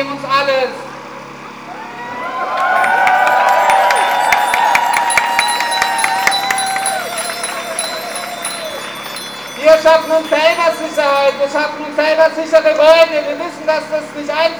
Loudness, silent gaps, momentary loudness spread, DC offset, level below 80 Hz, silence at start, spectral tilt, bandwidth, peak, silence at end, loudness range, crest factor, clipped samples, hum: -13 LUFS; none; 14 LU; 0.2%; -56 dBFS; 0 s; -1.5 dB/octave; over 20 kHz; 0 dBFS; 0 s; 5 LU; 14 dB; under 0.1%; none